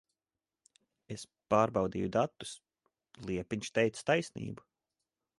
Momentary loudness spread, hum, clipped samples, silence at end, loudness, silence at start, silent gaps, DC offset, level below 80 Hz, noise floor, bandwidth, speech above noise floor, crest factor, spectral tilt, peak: 17 LU; none; under 0.1%; 0.85 s; -33 LUFS; 1.1 s; none; under 0.1%; -64 dBFS; under -90 dBFS; 11.5 kHz; over 57 dB; 22 dB; -5.5 dB/octave; -12 dBFS